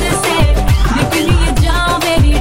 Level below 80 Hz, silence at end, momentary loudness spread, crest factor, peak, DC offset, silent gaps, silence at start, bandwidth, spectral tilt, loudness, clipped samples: -14 dBFS; 0 s; 1 LU; 10 dB; 0 dBFS; 3%; none; 0 s; 16.5 kHz; -5 dB/octave; -13 LUFS; under 0.1%